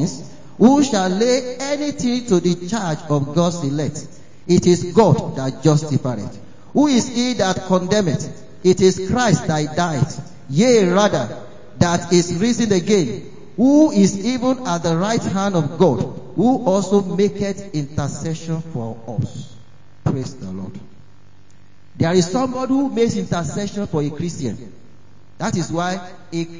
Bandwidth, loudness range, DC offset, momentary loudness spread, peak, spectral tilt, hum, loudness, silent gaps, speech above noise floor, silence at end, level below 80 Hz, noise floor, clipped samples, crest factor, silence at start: 7.6 kHz; 7 LU; 1%; 13 LU; 0 dBFS; -6 dB/octave; none; -18 LUFS; none; 33 dB; 0 s; -46 dBFS; -50 dBFS; under 0.1%; 18 dB; 0 s